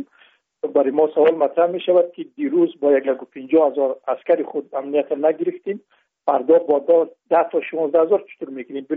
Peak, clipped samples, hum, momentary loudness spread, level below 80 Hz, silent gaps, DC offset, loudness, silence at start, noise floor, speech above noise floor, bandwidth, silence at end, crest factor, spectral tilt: -4 dBFS; under 0.1%; none; 13 LU; -74 dBFS; none; under 0.1%; -19 LUFS; 0 s; -56 dBFS; 37 dB; 3.8 kHz; 0 s; 14 dB; -4.5 dB/octave